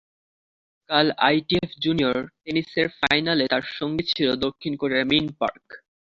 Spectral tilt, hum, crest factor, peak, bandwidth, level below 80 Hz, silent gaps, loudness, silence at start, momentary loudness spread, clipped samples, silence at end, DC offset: -6 dB/octave; none; 22 dB; -2 dBFS; 7.4 kHz; -56 dBFS; none; -23 LUFS; 0.9 s; 8 LU; under 0.1%; 0.35 s; under 0.1%